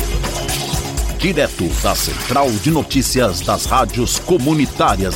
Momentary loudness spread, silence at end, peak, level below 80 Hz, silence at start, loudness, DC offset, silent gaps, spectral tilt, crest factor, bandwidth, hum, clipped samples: 5 LU; 0 s; -2 dBFS; -26 dBFS; 0 s; -17 LUFS; under 0.1%; none; -4 dB/octave; 14 dB; 17 kHz; none; under 0.1%